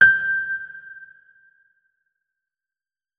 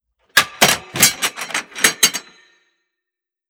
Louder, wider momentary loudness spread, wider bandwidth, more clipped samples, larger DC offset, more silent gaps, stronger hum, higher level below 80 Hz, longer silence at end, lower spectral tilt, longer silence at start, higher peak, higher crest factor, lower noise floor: second, -20 LUFS vs -15 LUFS; first, 24 LU vs 11 LU; second, 5 kHz vs over 20 kHz; neither; neither; neither; neither; second, -66 dBFS vs -56 dBFS; first, 2.15 s vs 1.3 s; first, -4 dB/octave vs 0 dB/octave; second, 0 s vs 0.35 s; about the same, -2 dBFS vs 0 dBFS; about the same, 22 dB vs 20 dB; first, under -90 dBFS vs -85 dBFS